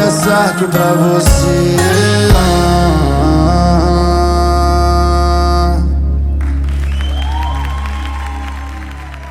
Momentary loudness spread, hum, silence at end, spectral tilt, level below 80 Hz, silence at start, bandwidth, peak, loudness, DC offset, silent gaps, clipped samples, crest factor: 11 LU; none; 0 s; -5.5 dB/octave; -16 dBFS; 0 s; 15.5 kHz; 0 dBFS; -12 LUFS; under 0.1%; none; under 0.1%; 12 dB